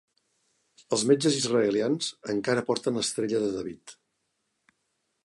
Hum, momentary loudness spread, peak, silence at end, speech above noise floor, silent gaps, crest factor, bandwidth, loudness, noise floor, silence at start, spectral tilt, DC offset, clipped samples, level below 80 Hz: none; 8 LU; -8 dBFS; 1.3 s; 51 dB; none; 20 dB; 11.5 kHz; -26 LUFS; -78 dBFS; 0.9 s; -4 dB/octave; under 0.1%; under 0.1%; -70 dBFS